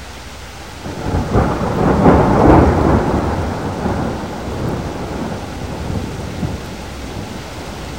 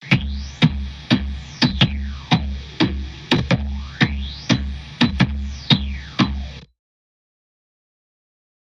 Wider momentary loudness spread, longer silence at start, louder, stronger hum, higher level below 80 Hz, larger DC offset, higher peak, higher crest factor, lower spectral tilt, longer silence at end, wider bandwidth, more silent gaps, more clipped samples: first, 17 LU vs 12 LU; about the same, 0 s vs 0 s; first, -17 LUFS vs -21 LUFS; neither; about the same, -26 dBFS vs -30 dBFS; first, 0.7% vs under 0.1%; about the same, 0 dBFS vs 0 dBFS; second, 16 dB vs 22 dB; first, -7 dB/octave vs -5.5 dB/octave; second, 0 s vs 2.05 s; first, 16 kHz vs 9.4 kHz; neither; neither